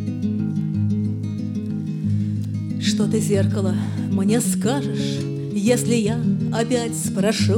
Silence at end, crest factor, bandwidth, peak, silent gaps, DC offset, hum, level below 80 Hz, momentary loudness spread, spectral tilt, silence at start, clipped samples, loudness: 0 s; 14 dB; 17 kHz; -6 dBFS; none; under 0.1%; none; -56 dBFS; 7 LU; -6 dB/octave; 0 s; under 0.1%; -22 LUFS